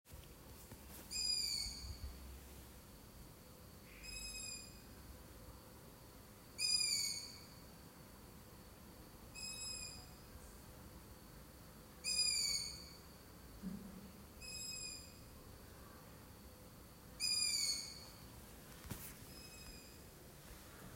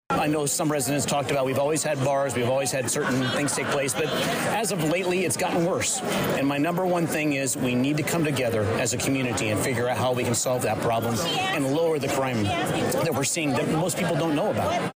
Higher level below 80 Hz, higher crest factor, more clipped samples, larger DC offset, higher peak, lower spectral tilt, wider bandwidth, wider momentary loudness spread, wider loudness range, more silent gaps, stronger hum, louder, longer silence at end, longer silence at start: second, -62 dBFS vs -56 dBFS; first, 22 dB vs 10 dB; neither; neither; second, -24 dBFS vs -16 dBFS; second, -1 dB/octave vs -4 dB/octave; about the same, 16 kHz vs 16 kHz; first, 22 LU vs 1 LU; first, 10 LU vs 0 LU; neither; neither; second, -41 LUFS vs -24 LUFS; about the same, 0 s vs 0.05 s; about the same, 0.05 s vs 0.1 s